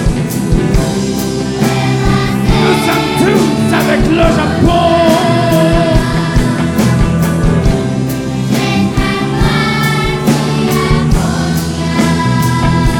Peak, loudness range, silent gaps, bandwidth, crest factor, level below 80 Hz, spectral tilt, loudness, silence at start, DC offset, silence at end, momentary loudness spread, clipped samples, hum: 0 dBFS; 2 LU; none; 18.5 kHz; 10 dB; -20 dBFS; -6 dB/octave; -12 LUFS; 0 s; under 0.1%; 0 s; 5 LU; under 0.1%; none